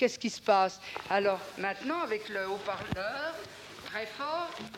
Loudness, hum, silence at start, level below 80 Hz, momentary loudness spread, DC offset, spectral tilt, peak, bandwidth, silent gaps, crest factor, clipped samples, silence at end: -32 LUFS; none; 0 s; -64 dBFS; 12 LU; under 0.1%; -4 dB/octave; -14 dBFS; 16.5 kHz; none; 20 dB; under 0.1%; 0 s